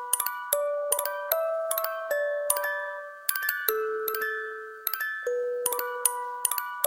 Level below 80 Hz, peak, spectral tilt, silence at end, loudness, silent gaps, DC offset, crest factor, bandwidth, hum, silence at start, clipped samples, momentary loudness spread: -86 dBFS; -4 dBFS; 2.5 dB/octave; 0 s; -28 LUFS; none; under 0.1%; 24 dB; 17 kHz; none; 0 s; under 0.1%; 4 LU